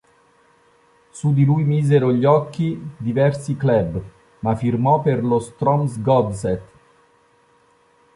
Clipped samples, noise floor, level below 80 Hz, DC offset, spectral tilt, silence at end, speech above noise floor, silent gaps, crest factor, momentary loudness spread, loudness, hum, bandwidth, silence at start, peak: under 0.1%; -57 dBFS; -48 dBFS; under 0.1%; -8.5 dB/octave; 1.55 s; 39 dB; none; 16 dB; 9 LU; -19 LUFS; none; 11.5 kHz; 1.15 s; -4 dBFS